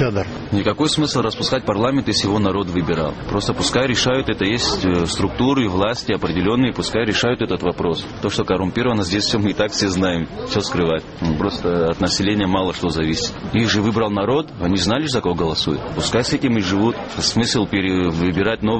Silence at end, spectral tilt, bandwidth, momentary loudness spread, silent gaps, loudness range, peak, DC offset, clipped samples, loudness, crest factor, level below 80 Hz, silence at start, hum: 0 s; -5 dB/octave; 8.8 kHz; 4 LU; none; 1 LU; -2 dBFS; 0.2%; under 0.1%; -19 LUFS; 16 dB; -38 dBFS; 0 s; none